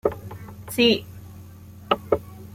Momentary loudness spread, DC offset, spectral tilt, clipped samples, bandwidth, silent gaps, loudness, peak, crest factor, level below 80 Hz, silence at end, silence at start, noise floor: 24 LU; under 0.1%; -4.5 dB/octave; under 0.1%; 16.5 kHz; none; -23 LUFS; -4 dBFS; 22 dB; -52 dBFS; 0.05 s; 0.05 s; -43 dBFS